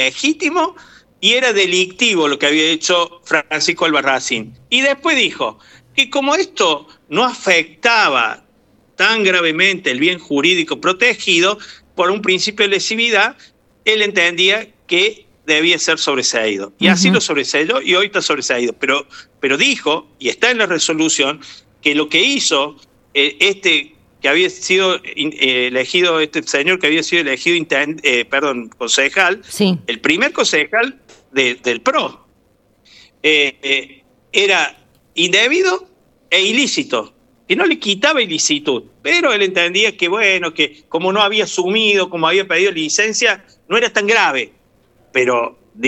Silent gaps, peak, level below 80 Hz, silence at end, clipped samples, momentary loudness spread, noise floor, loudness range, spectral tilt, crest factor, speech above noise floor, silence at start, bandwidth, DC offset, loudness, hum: none; 0 dBFS; -62 dBFS; 0 s; under 0.1%; 7 LU; -56 dBFS; 2 LU; -2.5 dB/octave; 16 dB; 41 dB; 0 s; 13.5 kHz; under 0.1%; -14 LUFS; none